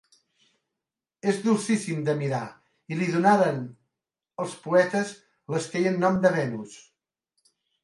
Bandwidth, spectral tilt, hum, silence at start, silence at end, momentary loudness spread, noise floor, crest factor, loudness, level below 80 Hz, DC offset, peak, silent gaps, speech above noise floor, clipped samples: 11.5 kHz; -6 dB/octave; none; 1.25 s; 1.05 s; 15 LU; -88 dBFS; 20 dB; -25 LUFS; -70 dBFS; under 0.1%; -6 dBFS; none; 64 dB; under 0.1%